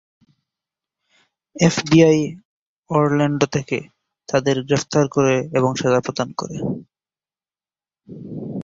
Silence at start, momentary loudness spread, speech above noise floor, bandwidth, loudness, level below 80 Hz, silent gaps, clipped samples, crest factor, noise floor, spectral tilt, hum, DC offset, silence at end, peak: 1.55 s; 14 LU; over 72 dB; 8 kHz; -19 LUFS; -56 dBFS; 2.45-2.83 s; under 0.1%; 18 dB; under -90 dBFS; -6 dB/octave; none; under 0.1%; 0 s; -2 dBFS